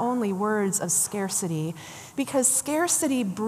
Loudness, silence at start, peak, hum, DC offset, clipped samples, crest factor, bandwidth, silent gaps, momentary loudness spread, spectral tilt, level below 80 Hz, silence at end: -24 LUFS; 0 s; -8 dBFS; none; under 0.1%; under 0.1%; 18 dB; 15 kHz; none; 11 LU; -3.5 dB/octave; -70 dBFS; 0 s